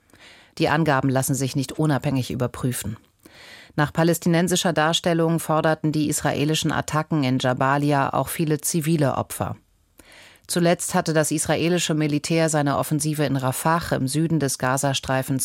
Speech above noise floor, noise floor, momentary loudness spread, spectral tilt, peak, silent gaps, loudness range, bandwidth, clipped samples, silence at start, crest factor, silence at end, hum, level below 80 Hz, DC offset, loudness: 32 dB; -53 dBFS; 6 LU; -5 dB/octave; -6 dBFS; none; 2 LU; 16.5 kHz; under 0.1%; 0.25 s; 16 dB; 0 s; none; -52 dBFS; under 0.1%; -22 LUFS